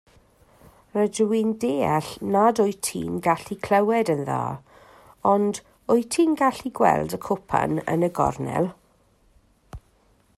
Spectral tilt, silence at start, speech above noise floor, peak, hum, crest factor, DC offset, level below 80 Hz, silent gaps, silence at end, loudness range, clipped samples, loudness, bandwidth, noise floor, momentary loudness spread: -5.5 dB/octave; 0.95 s; 39 dB; -4 dBFS; none; 20 dB; under 0.1%; -54 dBFS; none; 0.6 s; 2 LU; under 0.1%; -23 LUFS; 14.5 kHz; -61 dBFS; 8 LU